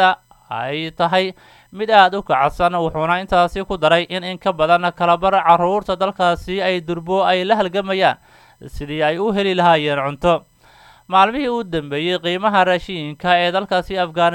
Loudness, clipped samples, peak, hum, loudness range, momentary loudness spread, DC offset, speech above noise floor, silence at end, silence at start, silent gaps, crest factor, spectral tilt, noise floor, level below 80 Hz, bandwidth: -17 LUFS; under 0.1%; 0 dBFS; none; 2 LU; 9 LU; under 0.1%; 31 dB; 0 s; 0 s; none; 18 dB; -5.5 dB/octave; -48 dBFS; -44 dBFS; 17 kHz